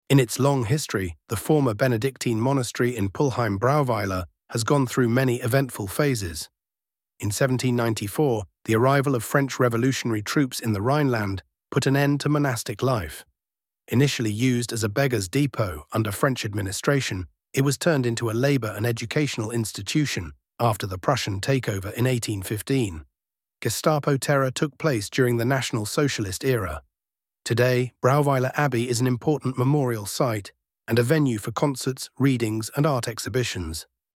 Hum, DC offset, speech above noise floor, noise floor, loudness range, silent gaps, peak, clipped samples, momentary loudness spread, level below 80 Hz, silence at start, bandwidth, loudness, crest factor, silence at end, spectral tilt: none; under 0.1%; over 67 dB; under -90 dBFS; 2 LU; none; -4 dBFS; under 0.1%; 8 LU; -52 dBFS; 0.1 s; 16.5 kHz; -24 LUFS; 20 dB; 0.35 s; -5.5 dB/octave